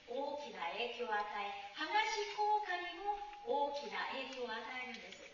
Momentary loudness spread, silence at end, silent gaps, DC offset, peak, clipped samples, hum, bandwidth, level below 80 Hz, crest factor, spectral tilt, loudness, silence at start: 9 LU; 0 s; none; under 0.1%; -22 dBFS; under 0.1%; none; 7.2 kHz; -74 dBFS; 20 dB; 1 dB/octave; -40 LUFS; 0 s